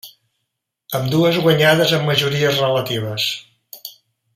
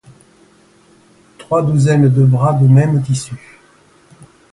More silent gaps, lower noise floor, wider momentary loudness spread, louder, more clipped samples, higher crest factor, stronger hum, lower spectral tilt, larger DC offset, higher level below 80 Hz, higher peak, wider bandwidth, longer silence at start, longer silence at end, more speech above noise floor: neither; first, -77 dBFS vs -49 dBFS; first, 21 LU vs 10 LU; second, -17 LUFS vs -13 LUFS; neither; about the same, 18 dB vs 14 dB; neither; second, -5 dB/octave vs -8 dB/octave; neither; second, -58 dBFS vs -50 dBFS; about the same, 0 dBFS vs 0 dBFS; first, 16 kHz vs 11.5 kHz; second, 0.05 s vs 1.5 s; second, 0.45 s vs 1.15 s; first, 61 dB vs 37 dB